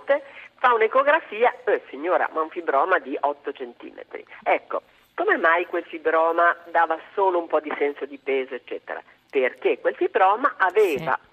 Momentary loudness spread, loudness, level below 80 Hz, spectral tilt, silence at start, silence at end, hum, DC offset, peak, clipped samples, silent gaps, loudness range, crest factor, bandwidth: 15 LU; -22 LUFS; -74 dBFS; -5 dB/octave; 0 s; 0.15 s; none; under 0.1%; -6 dBFS; under 0.1%; none; 3 LU; 18 dB; 14 kHz